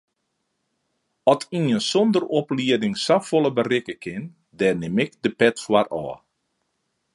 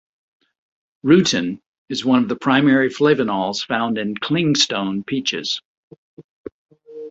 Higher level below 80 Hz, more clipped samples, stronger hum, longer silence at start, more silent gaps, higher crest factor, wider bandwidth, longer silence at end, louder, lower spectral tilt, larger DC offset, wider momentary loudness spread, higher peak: about the same, -64 dBFS vs -60 dBFS; neither; neither; first, 1.25 s vs 1.05 s; second, none vs 1.66-1.86 s, 5.65-5.91 s, 5.98-6.17 s, 6.24-6.44 s, 6.52-6.69 s; about the same, 22 dB vs 18 dB; first, 11.5 kHz vs 8 kHz; first, 1 s vs 0 s; second, -22 LUFS vs -18 LUFS; about the same, -5 dB/octave vs -4.5 dB/octave; neither; second, 13 LU vs 18 LU; about the same, -2 dBFS vs -2 dBFS